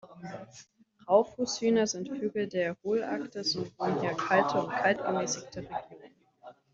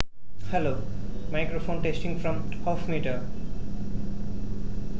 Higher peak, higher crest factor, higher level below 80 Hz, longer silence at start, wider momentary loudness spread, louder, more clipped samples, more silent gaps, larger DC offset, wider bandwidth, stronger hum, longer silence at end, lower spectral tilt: second, -10 dBFS vs -4 dBFS; about the same, 22 dB vs 24 dB; second, -70 dBFS vs -36 dBFS; about the same, 0.05 s vs 0 s; first, 14 LU vs 8 LU; about the same, -30 LUFS vs -32 LUFS; neither; neither; second, under 0.1% vs 6%; about the same, 7.8 kHz vs 8 kHz; neither; first, 0.2 s vs 0 s; second, -4 dB/octave vs -7.5 dB/octave